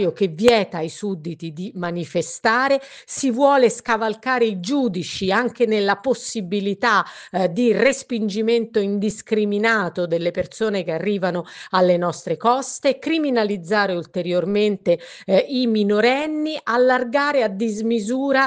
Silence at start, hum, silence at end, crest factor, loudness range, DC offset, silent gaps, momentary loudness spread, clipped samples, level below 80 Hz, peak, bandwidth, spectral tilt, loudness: 0 s; none; 0 s; 16 dB; 2 LU; under 0.1%; none; 8 LU; under 0.1%; -60 dBFS; -2 dBFS; 9.8 kHz; -5 dB/octave; -20 LUFS